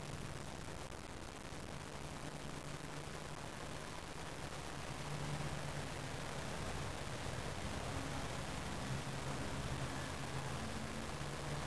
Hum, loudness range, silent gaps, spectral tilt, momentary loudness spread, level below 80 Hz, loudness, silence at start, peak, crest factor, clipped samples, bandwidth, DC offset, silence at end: none; 4 LU; none; -4.5 dB/octave; 5 LU; -56 dBFS; -45 LUFS; 0 s; -30 dBFS; 14 dB; under 0.1%; 11 kHz; 0.3%; 0 s